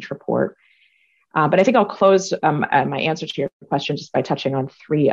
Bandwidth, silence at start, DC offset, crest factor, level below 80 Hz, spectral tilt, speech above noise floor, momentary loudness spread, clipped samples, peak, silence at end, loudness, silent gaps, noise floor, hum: 8 kHz; 0 s; under 0.1%; 16 dB; -62 dBFS; -5.5 dB/octave; 42 dB; 10 LU; under 0.1%; -4 dBFS; 0 s; -20 LUFS; 3.53-3.60 s; -61 dBFS; none